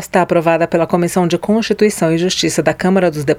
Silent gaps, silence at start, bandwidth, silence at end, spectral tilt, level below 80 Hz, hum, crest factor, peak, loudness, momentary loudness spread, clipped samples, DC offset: none; 0 s; 16 kHz; 0 s; -5 dB/octave; -46 dBFS; none; 14 dB; 0 dBFS; -14 LUFS; 2 LU; under 0.1%; under 0.1%